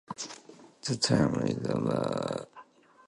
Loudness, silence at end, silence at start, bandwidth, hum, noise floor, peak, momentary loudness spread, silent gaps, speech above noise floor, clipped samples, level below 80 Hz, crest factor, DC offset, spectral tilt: -30 LUFS; 0.45 s; 0.1 s; 11.5 kHz; none; -55 dBFS; -12 dBFS; 15 LU; none; 26 dB; under 0.1%; -60 dBFS; 20 dB; under 0.1%; -5 dB/octave